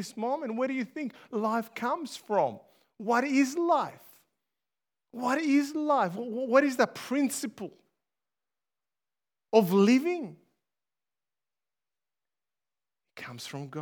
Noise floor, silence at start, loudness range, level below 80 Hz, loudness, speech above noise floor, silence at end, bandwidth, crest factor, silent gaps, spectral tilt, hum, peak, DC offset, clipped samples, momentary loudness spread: under -90 dBFS; 0 s; 3 LU; -88 dBFS; -28 LUFS; over 62 dB; 0 s; over 20 kHz; 22 dB; none; -5 dB/octave; none; -8 dBFS; under 0.1%; under 0.1%; 16 LU